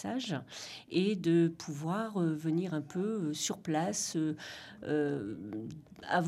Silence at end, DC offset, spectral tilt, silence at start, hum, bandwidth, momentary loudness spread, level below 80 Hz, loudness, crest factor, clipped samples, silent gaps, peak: 0 s; under 0.1%; -5 dB/octave; 0 s; none; 14 kHz; 14 LU; -72 dBFS; -34 LUFS; 18 dB; under 0.1%; none; -16 dBFS